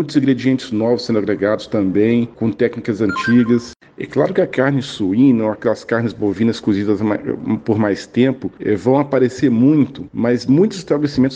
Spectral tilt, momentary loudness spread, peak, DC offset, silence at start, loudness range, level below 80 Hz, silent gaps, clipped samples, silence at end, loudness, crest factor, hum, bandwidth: -7 dB/octave; 7 LU; -2 dBFS; under 0.1%; 0 s; 2 LU; -52 dBFS; none; under 0.1%; 0 s; -17 LUFS; 14 dB; none; 9 kHz